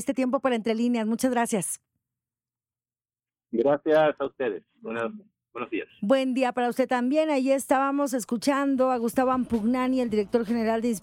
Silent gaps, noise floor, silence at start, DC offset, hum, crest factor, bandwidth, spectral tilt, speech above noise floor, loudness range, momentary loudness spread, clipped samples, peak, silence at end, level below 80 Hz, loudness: none; under -90 dBFS; 0 s; under 0.1%; none; 16 dB; 16.5 kHz; -4.5 dB/octave; over 65 dB; 4 LU; 9 LU; under 0.1%; -10 dBFS; 0.05 s; -62 dBFS; -25 LUFS